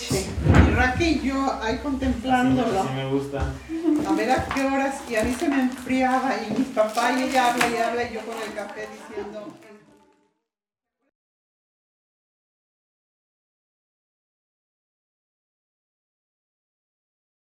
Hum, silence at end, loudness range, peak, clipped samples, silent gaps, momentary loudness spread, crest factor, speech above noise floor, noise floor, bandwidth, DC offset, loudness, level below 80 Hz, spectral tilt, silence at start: none; 7.75 s; 15 LU; -4 dBFS; under 0.1%; none; 13 LU; 22 dB; 65 dB; -89 dBFS; 18 kHz; under 0.1%; -23 LUFS; -38 dBFS; -5.5 dB/octave; 0 s